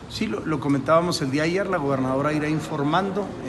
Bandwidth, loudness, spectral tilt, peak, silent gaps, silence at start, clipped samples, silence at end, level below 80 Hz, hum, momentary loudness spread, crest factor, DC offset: 12.5 kHz; -23 LUFS; -6 dB/octave; -6 dBFS; none; 0 s; under 0.1%; 0 s; -50 dBFS; none; 6 LU; 16 dB; under 0.1%